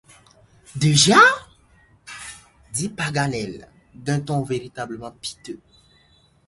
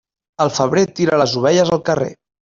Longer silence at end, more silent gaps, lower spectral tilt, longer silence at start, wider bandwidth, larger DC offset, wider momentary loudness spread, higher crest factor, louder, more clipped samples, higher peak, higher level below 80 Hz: first, 0.9 s vs 0.3 s; neither; second, -3.5 dB/octave vs -5 dB/octave; first, 0.75 s vs 0.4 s; first, 11.5 kHz vs 7.6 kHz; neither; first, 25 LU vs 6 LU; first, 22 dB vs 14 dB; second, -19 LUFS vs -16 LUFS; neither; about the same, -2 dBFS vs -2 dBFS; about the same, -54 dBFS vs -54 dBFS